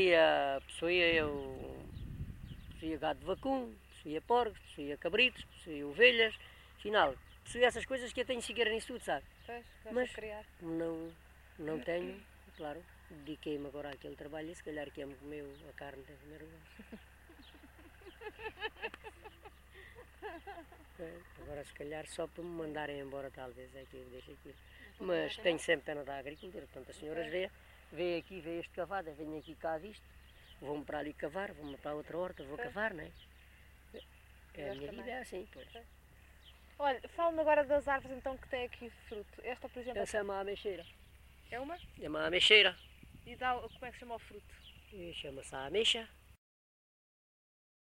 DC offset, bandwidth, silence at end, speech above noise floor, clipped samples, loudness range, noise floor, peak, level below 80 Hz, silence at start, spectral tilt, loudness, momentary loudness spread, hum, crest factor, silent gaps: under 0.1%; 16 kHz; 1.55 s; 23 dB; under 0.1%; 17 LU; -60 dBFS; -10 dBFS; -60 dBFS; 0 s; -3.5 dB/octave; -36 LUFS; 23 LU; none; 28 dB; none